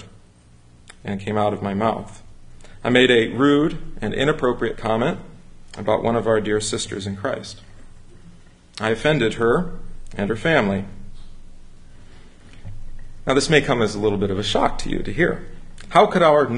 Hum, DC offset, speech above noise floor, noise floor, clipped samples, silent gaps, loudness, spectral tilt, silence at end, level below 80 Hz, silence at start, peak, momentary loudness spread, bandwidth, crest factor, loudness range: none; under 0.1%; 30 dB; -49 dBFS; under 0.1%; none; -20 LUFS; -5 dB/octave; 0 s; -40 dBFS; 0 s; -2 dBFS; 17 LU; 11 kHz; 20 dB; 5 LU